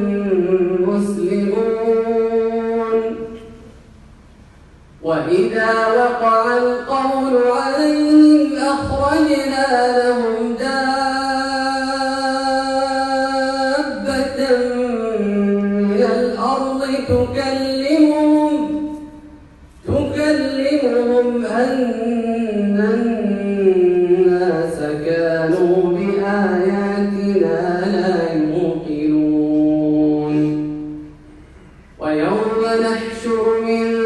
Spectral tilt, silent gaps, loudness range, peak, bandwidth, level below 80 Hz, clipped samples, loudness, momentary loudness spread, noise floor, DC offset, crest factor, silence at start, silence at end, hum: -6 dB/octave; none; 5 LU; -2 dBFS; 11.5 kHz; -46 dBFS; under 0.1%; -17 LUFS; 6 LU; -44 dBFS; under 0.1%; 14 dB; 0 s; 0 s; none